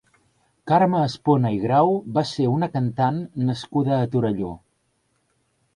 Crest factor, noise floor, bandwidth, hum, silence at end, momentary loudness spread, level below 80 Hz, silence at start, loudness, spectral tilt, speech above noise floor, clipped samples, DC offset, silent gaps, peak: 16 dB; -69 dBFS; 10.5 kHz; none; 1.2 s; 7 LU; -56 dBFS; 0.65 s; -22 LUFS; -8 dB/octave; 48 dB; under 0.1%; under 0.1%; none; -6 dBFS